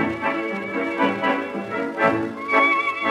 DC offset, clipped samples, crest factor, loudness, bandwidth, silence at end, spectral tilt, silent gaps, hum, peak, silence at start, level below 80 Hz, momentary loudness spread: under 0.1%; under 0.1%; 18 dB; -22 LUFS; 13 kHz; 0 s; -6 dB/octave; none; none; -4 dBFS; 0 s; -64 dBFS; 9 LU